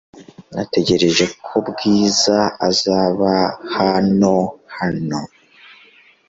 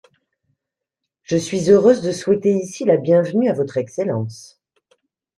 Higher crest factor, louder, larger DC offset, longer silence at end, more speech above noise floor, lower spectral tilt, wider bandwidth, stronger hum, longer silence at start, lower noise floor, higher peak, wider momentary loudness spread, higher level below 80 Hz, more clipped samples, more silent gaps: about the same, 16 dB vs 18 dB; about the same, -17 LUFS vs -18 LUFS; neither; about the same, 1.05 s vs 0.95 s; second, 33 dB vs 66 dB; second, -4.5 dB/octave vs -6.5 dB/octave; second, 7.8 kHz vs 11.5 kHz; neither; second, 0.15 s vs 1.3 s; second, -49 dBFS vs -83 dBFS; about the same, -2 dBFS vs -2 dBFS; about the same, 10 LU vs 10 LU; first, -50 dBFS vs -60 dBFS; neither; neither